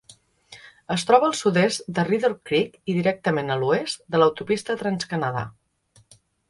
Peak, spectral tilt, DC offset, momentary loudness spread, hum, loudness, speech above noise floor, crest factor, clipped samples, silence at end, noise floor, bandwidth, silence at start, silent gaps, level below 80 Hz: -2 dBFS; -5 dB/octave; under 0.1%; 8 LU; none; -23 LUFS; 37 dB; 20 dB; under 0.1%; 1 s; -60 dBFS; 11.5 kHz; 0.5 s; none; -62 dBFS